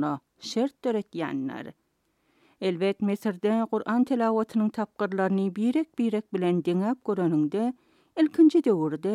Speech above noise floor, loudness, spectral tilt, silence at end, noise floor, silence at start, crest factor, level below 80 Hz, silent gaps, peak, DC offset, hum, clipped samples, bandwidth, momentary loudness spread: 46 dB; -26 LUFS; -7.5 dB/octave; 0 s; -71 dBFS; 0 s; 16 dB; -78 dBFS; none; -10 dBFS; under 0.1%; none; under 0.1%; 12 kHz; 8 LU